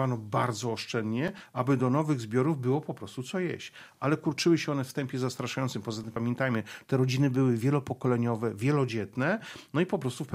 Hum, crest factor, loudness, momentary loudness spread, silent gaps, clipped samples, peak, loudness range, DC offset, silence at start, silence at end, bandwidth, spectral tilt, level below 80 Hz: none; 18 dB; -30 LUFS; 8 LU; none; under 0.1%; -12 dBFS; 2 LU; under 0.1%; 0 s; 0 s; 15 kHz; -6.5 dB/octave; -70 dBFS